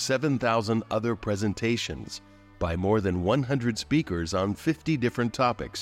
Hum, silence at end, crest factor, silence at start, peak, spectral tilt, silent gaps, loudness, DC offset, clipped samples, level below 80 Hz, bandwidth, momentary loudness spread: none; 0 s; 14 dB; 0 s; -12 dBFS; -5.5 dB/octave; none; -27 LUFS; under 0.1%; under 0.1%; -50 dBFS; 16 kHz; 6 LU